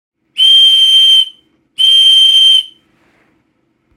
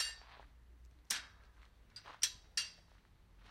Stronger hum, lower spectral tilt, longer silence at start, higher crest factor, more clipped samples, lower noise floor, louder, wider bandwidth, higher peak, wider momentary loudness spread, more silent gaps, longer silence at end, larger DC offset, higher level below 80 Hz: neither; second, 5 dB/octave vs 1.5 dB/octave; first, 0.35 s vs 0 s; second, 10 dB vs 32 dB; neither; second, -60 dBFS vs -65 dBFS; first, -4 LUFS vs -40 LUFS; about the same, 17 kHz vs 16 kHz; first, 0 dBFS vs -16 dBFS; second, 7 LU vs 25 LU; neither; first, 1.3 s vs 0 s; neither; second, -72 dBFS vs -64 dBFS